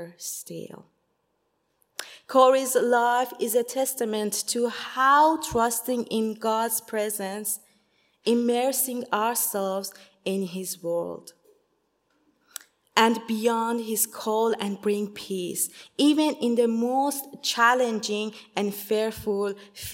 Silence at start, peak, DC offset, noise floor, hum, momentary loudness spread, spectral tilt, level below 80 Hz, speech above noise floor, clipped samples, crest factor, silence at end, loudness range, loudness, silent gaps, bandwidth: 0 s; -2 dBFS; under 0.1%; -73 dBFS; none; 14 LU; -3 dB/octave; -62 dBFS; 48 dB; under 0.1%; 24 dB; 0 s; 5 LU; -25 LUFS; none; 16.5 kHz